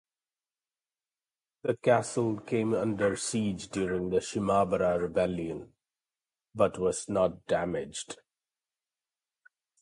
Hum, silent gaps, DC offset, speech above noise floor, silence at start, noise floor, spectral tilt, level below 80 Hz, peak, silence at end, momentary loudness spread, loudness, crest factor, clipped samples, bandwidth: none; none; under 0.1%; over 61 dB; 1.65 s; under -90 dBFS; -5.5 dB/octave; -58 dBFS; -12 dBFS; 1.65 s; 12 LU; -30 LUFS; 20 dB; under 0.1%; 11.5 kHz